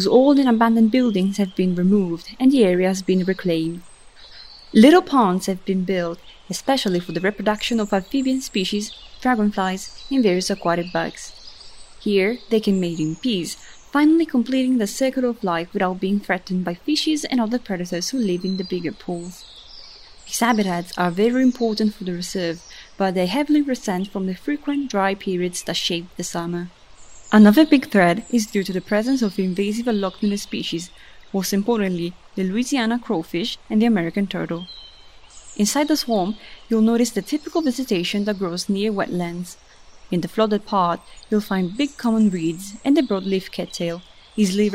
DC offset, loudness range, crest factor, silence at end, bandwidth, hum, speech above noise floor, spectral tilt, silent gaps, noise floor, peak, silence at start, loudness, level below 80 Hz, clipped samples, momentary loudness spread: under 0.1%; 5 LU; 18 dB; 0 s; 16 kHz; none; 25 dB; -5 dB/octave; none; -44 dBFS; -2 dBFS; 0 s; -21 LUFS; -52 dBFS; under 0.1%; 13 LU